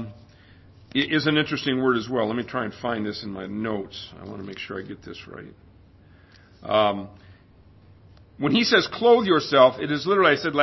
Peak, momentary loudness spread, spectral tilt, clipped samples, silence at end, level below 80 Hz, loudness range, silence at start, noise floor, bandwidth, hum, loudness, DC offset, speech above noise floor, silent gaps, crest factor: -4 dBFS; 20 LU; -5.5 dB/octave; under 0.1%; 0 s; -56 dBFS; 12 LU; 0 s; -52 dBFS; 6.2 kHz; none; -22 LUFS; under 0.1%; 30 dB; none; 20 dB